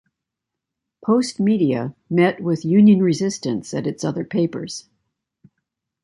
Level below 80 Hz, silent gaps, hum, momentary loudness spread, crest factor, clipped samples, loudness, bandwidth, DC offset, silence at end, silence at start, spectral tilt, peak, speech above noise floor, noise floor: -62 dBFS; none; none; 12 LU; 16 dB; under 0.1%; -19 LUFS; 11 kHz; under 0.1%; 1.25 s; 1.05 s; -6.5 dB/octave; -4 dBFS; 65 dB; -83 dBFS